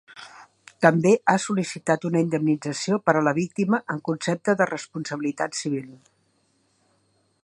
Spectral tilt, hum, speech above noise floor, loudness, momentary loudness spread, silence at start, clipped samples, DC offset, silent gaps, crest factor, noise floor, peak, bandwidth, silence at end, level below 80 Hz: -5.5 dB/octave; none; 44 dB; -23 LUFS; 10 LU; 0.1 s; under 0.1%; under 0.1%; none; 24 dB; -67 dBFS; 0 dBFS; 11.5 kHz; 1.5 s; -70 dBFS